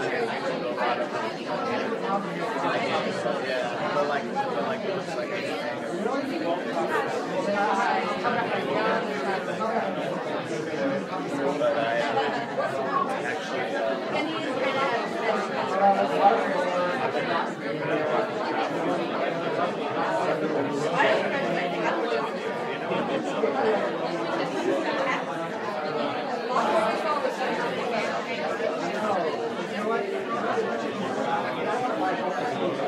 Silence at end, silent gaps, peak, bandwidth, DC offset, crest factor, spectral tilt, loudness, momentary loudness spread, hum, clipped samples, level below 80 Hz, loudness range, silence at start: 0 s; none; -6 dBFS; 14 kHz; under 0.1%; 20 dB; -5 dB/octave; -27 LUFS; 5 LU; none; under 0.1%; -74 dBFS; 3 LU; 0 s